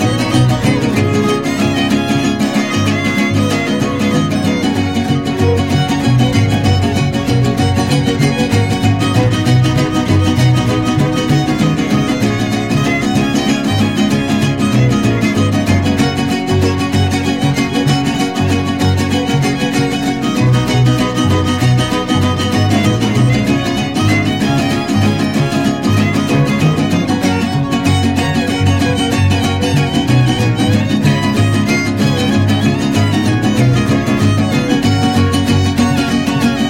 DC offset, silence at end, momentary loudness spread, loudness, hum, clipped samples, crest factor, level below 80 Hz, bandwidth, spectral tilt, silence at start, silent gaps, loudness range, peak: 0.6%; 0 s; 3 LU; -13 LUFS; none; under 0.1%; 12 dB; -34 dBFS; 16.5 kHz; -6 dB/octave; 0 s; none; 1 LU; -2 dBFS